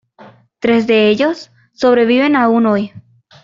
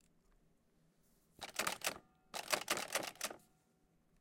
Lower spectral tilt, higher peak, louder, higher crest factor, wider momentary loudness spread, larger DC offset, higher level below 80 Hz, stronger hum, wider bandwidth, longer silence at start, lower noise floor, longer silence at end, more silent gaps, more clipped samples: first, -6 dB/octave vs -0.5 dB/octave; first, -2 dBFS vs -18 dBFS; first, -13 LUFS vs -41 LUFS; second, 12 dB vs 28 dB; second, 8 LU vs 14 LU; neither; first, -56 dBFS vs -78 dBFS; neither; second, 7.6 kHz vs 17 kHz; second, 0.2 s vs 1.4 s; second, -43 dBFS vs -75 dBFS; second, 0.45 s vs 0.85 s; neither; neither